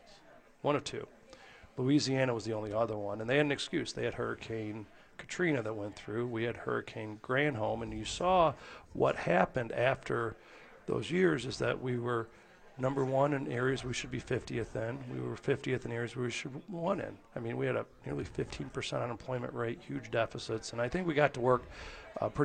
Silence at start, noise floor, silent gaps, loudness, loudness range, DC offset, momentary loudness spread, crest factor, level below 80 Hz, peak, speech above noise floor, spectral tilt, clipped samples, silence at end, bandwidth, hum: 0.05 s; -59 dBFS; none; -34 LUFS; 5 LU; under 0.1%; 13 LU; 22 dB; -58 dBFS; -12 dBFS; 25 dB; -5.5 dB/octave; under 0.1%; 0 s; 9.4 kHz; none